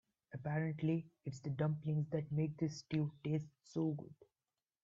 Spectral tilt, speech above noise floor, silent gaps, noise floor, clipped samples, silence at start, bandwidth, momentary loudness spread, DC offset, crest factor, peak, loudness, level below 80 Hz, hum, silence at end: -8 dB/octave; over 50 dB; none; under -90 dBFS; under 0.1%; 0.3 s; 7.6 kHz; 9 LU; under 0.1%; 16 dB; -24 dBFS; -41 LUFS; -74 dBFS; none; 0.7 s